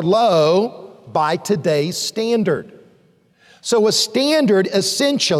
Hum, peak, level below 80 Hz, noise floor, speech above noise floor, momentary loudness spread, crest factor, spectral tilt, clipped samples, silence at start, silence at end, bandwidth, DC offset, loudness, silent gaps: none; -6 dBFS; -64 dBFS; -55 dBFS; 39 dB; 7 LU; 12 dB; -4 dB/octave; under 0.1%; 0 s; 0 s; 15.5 kHz; under 0.1%; -17 LUFS; none